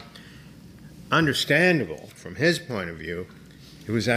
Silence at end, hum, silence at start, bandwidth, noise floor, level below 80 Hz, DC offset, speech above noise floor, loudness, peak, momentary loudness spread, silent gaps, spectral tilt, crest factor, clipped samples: 0 s; none; 0 s; 15.5 kHz; -46 dBFS; -56 dBFS; under 0.1%; 22 dB; -23 LUFS; -6 dBFS; 23 LU; none; -5 dB/octave; 20 dB; under 0.1%